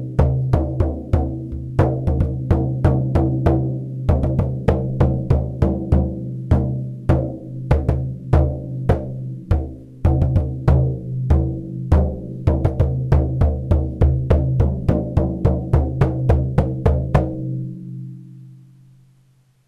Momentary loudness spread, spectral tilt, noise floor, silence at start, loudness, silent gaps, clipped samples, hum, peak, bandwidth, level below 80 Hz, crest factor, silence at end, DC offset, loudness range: 7 LU; -10.5 dB/octave; -56 dBFS; 0 s; -20 LUFS; none; under 0.1%; none; -6 dBFS; 5.6 kHz; -24 dBFS; 12 dB; 1.1 s; under 0.1%; 2 LU